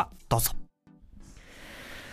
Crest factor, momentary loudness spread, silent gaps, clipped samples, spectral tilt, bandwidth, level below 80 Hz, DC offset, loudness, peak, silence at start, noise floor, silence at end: 22 dB; 25 LU; none; under 0.1%; -4 dB/octave; 15.5 kHz; -44 dBFS; under 0.1%; -30 LUFS; -10 dBFS; 0 s; -56 dBFS; 0 s